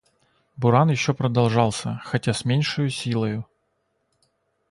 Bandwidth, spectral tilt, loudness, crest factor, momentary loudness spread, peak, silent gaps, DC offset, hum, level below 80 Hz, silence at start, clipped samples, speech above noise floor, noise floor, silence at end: 11.5 kHz; -6 dB/octave; -22 LUFS; 20 dB; 9 LU; -4 dBFS; none; under 0.1%; none; -56 dBFS; 0.6 s; under 0.1%; 50 dB; -72 dBFS; 1.25 s